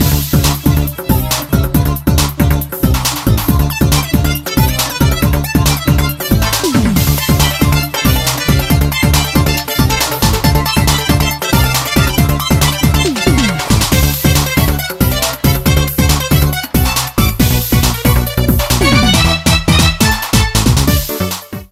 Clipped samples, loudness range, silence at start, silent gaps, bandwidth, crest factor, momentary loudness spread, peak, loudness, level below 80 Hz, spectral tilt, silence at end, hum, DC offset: under 0.1%; 2 LU; 0 s; none; 16.5 kHz; 12 dB; 3 LU; 0 dBFS; -12 LUFS; -18 dBFS; -4.5 dB/octave; 0.05 s; none; under 0.1%